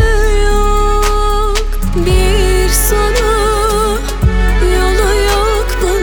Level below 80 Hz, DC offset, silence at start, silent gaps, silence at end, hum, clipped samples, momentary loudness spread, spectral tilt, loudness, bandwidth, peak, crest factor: -12 dBFS; under 0.1%; 0 s; none; 0 s; none; under 0.1%; 4 LU; -4.5 dB/octave; -13 LUFS; 19.5 kHz; 0 dBFS; 10 dB